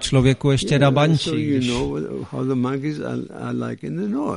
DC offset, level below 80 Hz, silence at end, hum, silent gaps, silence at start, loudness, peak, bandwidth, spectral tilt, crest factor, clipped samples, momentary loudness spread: under 0.1%; -42 dBFS; 0 s; none; none; 0 s; -21 LUFS; -4 dBFS; 11 kHz; -6 dB/octave; 16 dB; under 0.1%; 11 LU